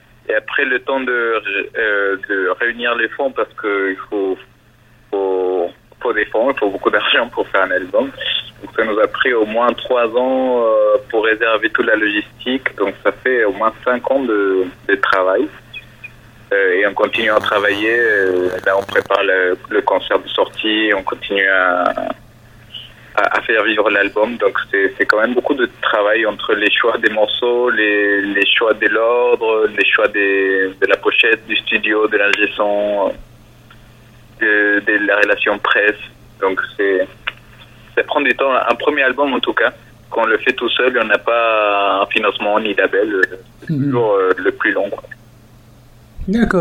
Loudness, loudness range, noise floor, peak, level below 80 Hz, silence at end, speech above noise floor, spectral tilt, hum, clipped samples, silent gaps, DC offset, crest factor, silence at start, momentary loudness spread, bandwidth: -15 LUFS; 4 LU; -49 dBFS; 0 dBFS; -48 dBFS; 0 s; 33 dB; -5.5 dB/octave; none; under 0.1%; none; under 0.1%; 16 dB; 0.3 s; 7 LU; 15 kHz